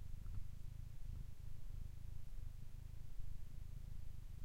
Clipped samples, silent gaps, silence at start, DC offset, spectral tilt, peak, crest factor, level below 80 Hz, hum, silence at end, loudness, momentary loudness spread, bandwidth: under 0.1%; none; 0 s; under 0.1%; -6.5 dB/octave; -32 dBFS; 14 dB; -50 dBFS; none; 0 s; -56 LUFS; 3 LU; 15.5 kHz